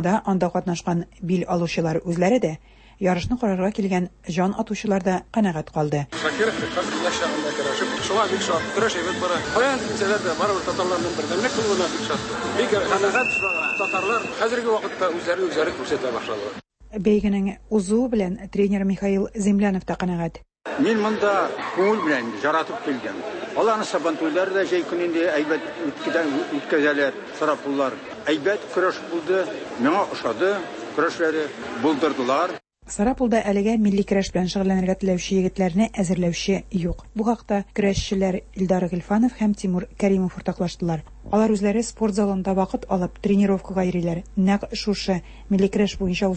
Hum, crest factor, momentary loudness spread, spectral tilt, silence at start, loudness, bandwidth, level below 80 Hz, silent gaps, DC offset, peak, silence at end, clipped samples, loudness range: none; 16 dB; 6 LU; -5.5 dB/octave; 0 s; -23 LUFS; 8.8 kHz; -46 dBFS; none; under 0.1%; -8 dBFS; 0 s; under 0.1%; 2 LU